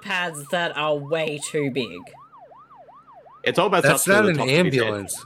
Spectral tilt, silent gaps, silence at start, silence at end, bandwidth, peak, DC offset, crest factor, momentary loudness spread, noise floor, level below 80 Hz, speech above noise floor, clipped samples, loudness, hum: -4 dB/octave; none; 0 s; 0 s; 16.5 kHz; -4 dBFS; under 0.1%; 18 dB; 9 LU; -48 dBFS; -64 dBFS; 26 dB; under 0.1%; -21 LUFS; none